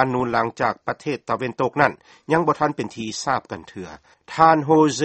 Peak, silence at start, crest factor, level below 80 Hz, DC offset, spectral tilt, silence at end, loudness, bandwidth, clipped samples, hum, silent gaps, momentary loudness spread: 0 dBFS; 0 s; 22 dB; -56 dBFS; under 0.1%; -5.5 dB/octave; 0 s; -21 LUFS; 8.8 kHz; under 0.1%; none; none; 18 LU